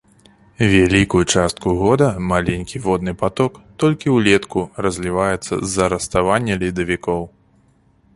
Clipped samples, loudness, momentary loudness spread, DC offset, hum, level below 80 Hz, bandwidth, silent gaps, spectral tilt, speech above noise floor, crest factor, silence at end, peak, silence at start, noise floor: under 0.1%; -18 LUFS; 8 LU; under 0.1%; none; -38 dBFS; 11.5 kHz; none; -5 dB/octave; 38 dB; 18 dB; 0.85 s; 0 dBFS; 0.6 s; -55 dBFS